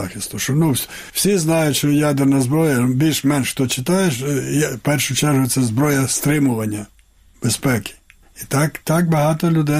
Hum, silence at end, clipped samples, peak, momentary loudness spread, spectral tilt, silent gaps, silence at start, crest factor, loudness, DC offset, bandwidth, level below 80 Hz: none; 0 s; under 0.1%; -6 dBFS; 7 LU; -5 dB/octave; none; 0 s; 12 dB; -18 LUFS; under 0.1%; 16 kHz; -48 dBFS